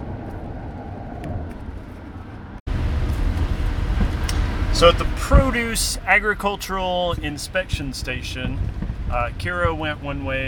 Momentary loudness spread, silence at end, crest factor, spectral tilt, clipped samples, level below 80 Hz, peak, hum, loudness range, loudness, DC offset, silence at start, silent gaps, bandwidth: 17 LU; 0 s; 22 dB; -4.5 dB/octave; under 0.1%; -26 dBFS; 0 dBFS; none; 9 LU; -22 LUFS; under 0.1%; 0 s; 2.60-2.66 s; 18.5 kHz